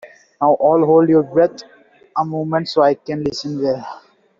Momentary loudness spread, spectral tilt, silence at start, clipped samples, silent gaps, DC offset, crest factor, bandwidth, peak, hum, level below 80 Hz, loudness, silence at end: 10 LU; -5.5 dB/octave; 0.05 s; under 0.1%; none; under 0.1%; 14 dB; 7.4 kHz; -2 dBFS; none; -58 dBFS; -17 LUFS; 0.4 s